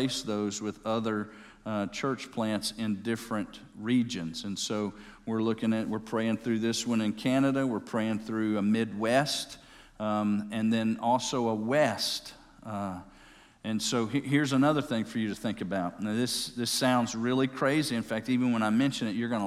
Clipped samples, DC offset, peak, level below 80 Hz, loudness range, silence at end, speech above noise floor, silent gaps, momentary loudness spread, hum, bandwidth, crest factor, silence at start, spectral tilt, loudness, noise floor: under 0.1%; under 0.1%; -12 dBFS; -62 dBFS; 4 LU; 0 s; 26 dB; none; 10 LU; none; 15 kHz; 18 dB; 0 s; -4.5 dB/octave; -30 LUFS; -56 dBFS